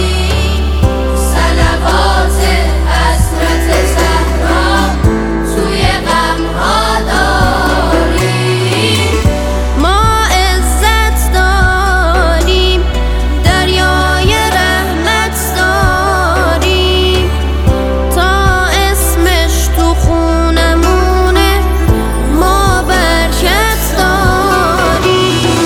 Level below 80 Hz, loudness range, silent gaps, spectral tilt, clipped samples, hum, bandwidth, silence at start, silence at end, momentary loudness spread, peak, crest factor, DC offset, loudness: -14 dBFS; 1 LU; none; -4.5 dB/octave; under 0.1%; none; 17 kHz; 0 s; 0 s; 3 LU; 0 dBFS; 10 dB; under 0.1%; -11 LUFS